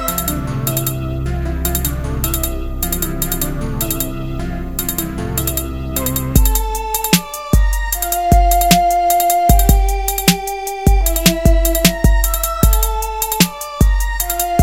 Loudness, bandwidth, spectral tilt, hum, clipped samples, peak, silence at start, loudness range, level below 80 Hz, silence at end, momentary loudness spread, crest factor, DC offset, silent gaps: -16 LUFS; 17.5 kHz; -4.5 dB/octave; none; under 0.1%; 0 dBFS; 0 s; 6 LU; -18 dBFS; 0 s; 9 LU; 16 dB; under 0.1%; none